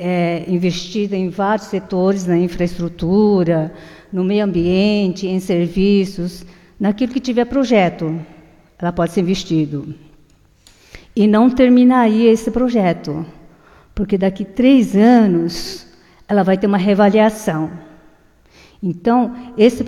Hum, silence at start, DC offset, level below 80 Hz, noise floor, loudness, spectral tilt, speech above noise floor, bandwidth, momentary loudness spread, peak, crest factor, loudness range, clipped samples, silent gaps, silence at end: none; 0 s; under 0.1%; -42 dBFS; -51 dBFS; -16 LUFS; -7 dB/octave; 36 dB; 13 kHz; 14 LU; 0 dBFS; 16 dB; 4 LU; under 0.1%; none; 0 s